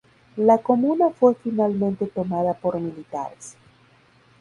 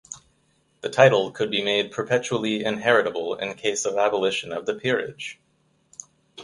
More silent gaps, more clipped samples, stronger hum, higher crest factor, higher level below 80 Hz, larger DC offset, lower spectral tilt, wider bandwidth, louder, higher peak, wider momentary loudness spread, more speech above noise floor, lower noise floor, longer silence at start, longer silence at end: neither; neither; neither; about the same, 20 dB vs 24 dB; about the same, -62 dBFS vs -66 dBFS; neither; first, -8.5 dB/octave vs -3.5 dB/octave; about the same, 11 kHz vs 11.5 kHz; about the same, -22 LUFS vs -23 LUFS; about the same, -4 dBFS vs -2 dBFS; second, 15 LU vs 21 LU; second, 35 dB vs 43 dB; second, -56 dBFS vs -66 dBFS; first, 0.35 s vs 0.1 s; first, 0.9 s vs 0 s